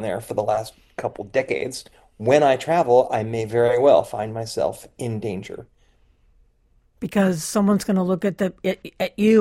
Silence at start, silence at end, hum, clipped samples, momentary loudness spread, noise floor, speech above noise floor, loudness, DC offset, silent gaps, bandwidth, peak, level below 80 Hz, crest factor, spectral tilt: 0 s; 0 s; none; under 0.1%; 14 LU; -60 dBFS; 40 dB; -21 LUFS; under 0.1%; none; 16 kHz; -2 dBFS; -56 dBFS; 18 dB; -6 dB/octave